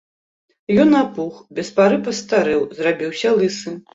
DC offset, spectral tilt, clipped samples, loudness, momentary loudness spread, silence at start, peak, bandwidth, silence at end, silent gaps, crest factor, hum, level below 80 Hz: under 0.1%; -5.5 dB/octave; under 0.1%; -18 LUFS; 13 LU; 0.7 s; -2 dBFS; 8 kHz; 0.15 s; none; 16 dB; none; -58 dBFS